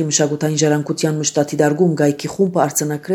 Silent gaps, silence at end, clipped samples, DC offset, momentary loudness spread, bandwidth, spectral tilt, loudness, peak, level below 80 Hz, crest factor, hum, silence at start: none; 0 s; under 0.1%; under 0.1%; 3 LU; 20 kHz; -4.5 dB/octave; -17 LUFS; 0 dBFS; -60 dBFS; 16 dB; none; 0 s